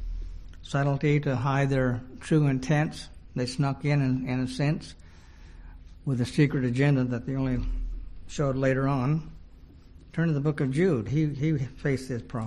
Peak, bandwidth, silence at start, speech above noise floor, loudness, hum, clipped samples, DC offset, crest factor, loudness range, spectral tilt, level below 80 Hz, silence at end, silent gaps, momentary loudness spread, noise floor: -10 dBFS; 11 kHz; 0 s; 23 dB; -27 LUFS; none; under 0.1%; under 0.1%; 16 dB; 3 LU; -7.5 dB/octave; -42 dBFS; 0 s; none; 13 LU; -49 dBFS